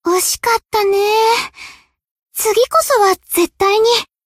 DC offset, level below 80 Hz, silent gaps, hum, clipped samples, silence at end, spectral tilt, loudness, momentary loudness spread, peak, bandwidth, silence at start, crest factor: under 0.1%; -50 dBFS; 2.11-2.16 s; none; under 0.1%; 0.2 s; -1 dB/octave; -14 LUFS; 6 LU; -2 dBFS; 16 kHz; 0.05 s; 14 dB